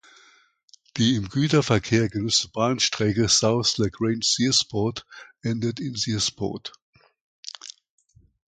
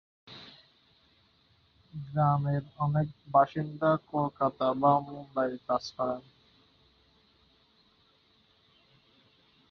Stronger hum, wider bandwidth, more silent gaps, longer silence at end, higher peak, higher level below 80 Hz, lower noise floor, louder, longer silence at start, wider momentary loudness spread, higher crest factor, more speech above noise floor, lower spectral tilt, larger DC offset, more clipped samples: neither; first, 9.6 kHz vs 6.6 kHz; first, 6.82-6.93 s, 7.21-7.43 s vs none; second, 0.75 s vs 3.5 s; first, -6 dBFS vs -12 dBFS; first, -52 dBFS vs -66 dBFS; second, -58 dBFS vs -66 dBFS; first, -23 LUFS vs -29 LUFS; first, 0.95 s vs 0.3 s; second, 18 LU vs 21 LU; about the same, 20 dB vs 20 dB; about the same, 35 dB vs 38 dB; second, -4 dB/octave vs -8.5 dB/octave; neither; neither